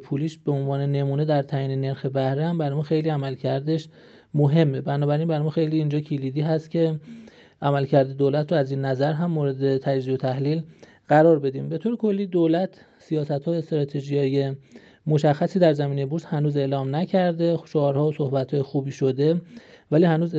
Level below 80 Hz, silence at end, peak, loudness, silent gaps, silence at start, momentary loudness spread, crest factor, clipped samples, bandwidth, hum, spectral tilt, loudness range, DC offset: -70 dBFS; 0 s; -4 dBFS; -23 LUFS; none; 0 s; 7 LU; 18 dB; under 0.1%; 7.4 kHz; none; -9 dB/octave; 2 LU; under 0.1%